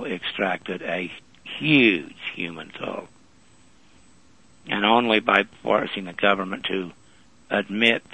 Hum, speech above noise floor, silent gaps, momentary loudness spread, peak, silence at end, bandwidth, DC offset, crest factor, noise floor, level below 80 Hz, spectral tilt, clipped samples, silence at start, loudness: none; 33 dB; none; 15 LU; -2 dBFS; 0.15 s; 10 kHz; 0.2%; 24 dB; -56 dBFS; -64 dBFS; -5.5 dB/octave; under 0.1%; 0 s; -23 LUFS